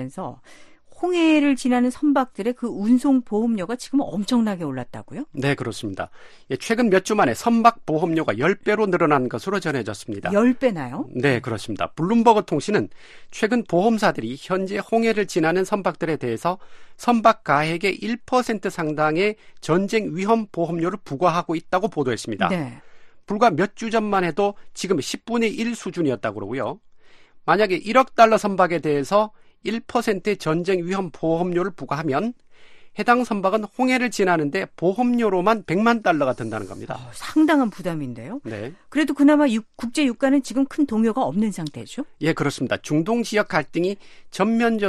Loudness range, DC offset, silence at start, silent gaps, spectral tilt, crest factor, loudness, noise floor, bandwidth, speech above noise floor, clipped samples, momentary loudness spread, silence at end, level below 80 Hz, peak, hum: 4 LU; under 0.1%; 0 s; none; -5.5 dB/octave; 20 dB; -21 LUFS; -46 dBFS; 13 kHz; 25 dB; under 0.1%; 12 LU; 0 s; -56 dBFS; 0 dBFS; none